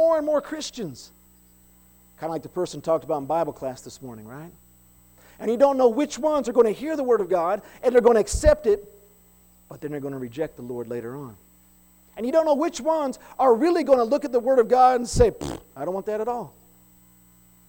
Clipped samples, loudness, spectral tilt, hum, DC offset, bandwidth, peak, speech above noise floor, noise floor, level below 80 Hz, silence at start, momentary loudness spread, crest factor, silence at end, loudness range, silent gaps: under 0.1%; -23 LUFS; -5.5 dB/octave; 60 Hz at -60 dBFS; under 0.1%; 19 kHz; -6 dBFS; 33 dB; -55 dBFS; -42 dBFS; 0 s; 17 LU; 18 dB; 1.2 s; 9 LU; none